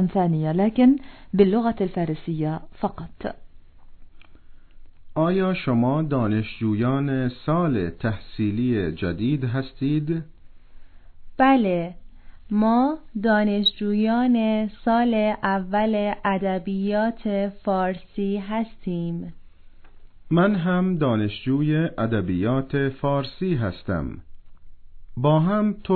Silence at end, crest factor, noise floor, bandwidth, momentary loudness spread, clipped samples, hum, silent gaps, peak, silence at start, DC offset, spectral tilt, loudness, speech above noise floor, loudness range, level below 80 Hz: 0 s; 20 dB; -44 dBFS; 4.5 kHz; 9 LU; under 0.1%; none; none; -4 dBFS; 0 s; under 0.1%; -10.5 dB/octave; -23 LUFS; 22 dB; 5 LU; -46 dBFS